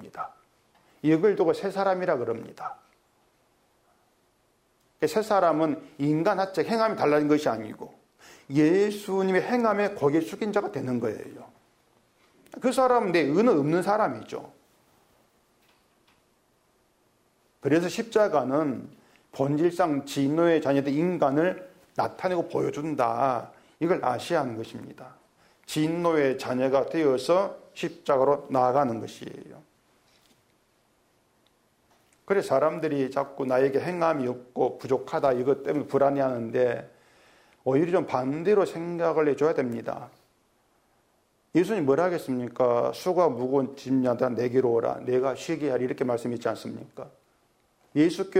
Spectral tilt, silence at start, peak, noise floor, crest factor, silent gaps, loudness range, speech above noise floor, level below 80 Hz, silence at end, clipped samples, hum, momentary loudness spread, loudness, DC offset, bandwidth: -6.5 dB/octave; 0 s; -10 dBFS; -68 dBFS; 16 dB; none; 5 LU; 43 dB; -70 dBFS; 0 s; under 0.1%; none; 13 LU; -26 LUFS; under 0.1%; 16 kHz